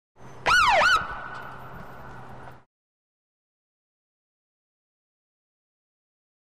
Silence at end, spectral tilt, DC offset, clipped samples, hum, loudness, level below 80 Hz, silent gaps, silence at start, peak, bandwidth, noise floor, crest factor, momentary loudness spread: 4 s; -1.5 dB/octave; 0.6%; under 0.1%; none; -21 LUFS; -52 dBFS; none; 0.25 s; -12 dBFS; 15.5 kHz; -44 dBFS; 16 dB; 25 LU